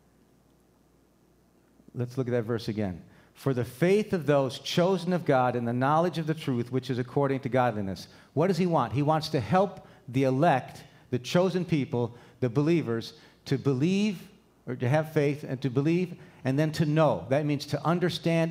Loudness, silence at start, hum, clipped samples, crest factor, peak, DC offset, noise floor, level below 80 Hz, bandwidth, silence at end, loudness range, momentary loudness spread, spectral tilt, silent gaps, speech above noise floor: -28 LUFS; 1.95 s; none; under 0.1%; 18 dB; -10 dBFS; under 0.1%; -63 dBFS; -66 dBFS; 16 kHz; 0 s; 3 LU; 10 LU; -7 dB/octave; none; 36 dB